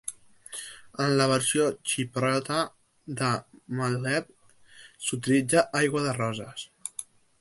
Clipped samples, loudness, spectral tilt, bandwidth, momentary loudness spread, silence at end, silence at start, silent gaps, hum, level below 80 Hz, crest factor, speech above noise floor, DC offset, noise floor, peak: under 0.1%; -27 LUFS; -4 dB/octave; 12 kHz; 16 LU; 0.4 s; 0.05 s; none; none; -66 dBFS; 22 dB; 27 dB; under 0.1%; -53 dBFS; -8 dBFS